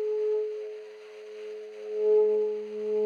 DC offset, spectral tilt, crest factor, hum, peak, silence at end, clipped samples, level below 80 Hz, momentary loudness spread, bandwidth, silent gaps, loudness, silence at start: under 0.1%; -5.5 dB/octave; 12 dB; none; -16 dBFS; 0 s; under 0.1%; under -90 dBFS; 20 LU; 6.6 kHz; none; -28 LUFS; 0 s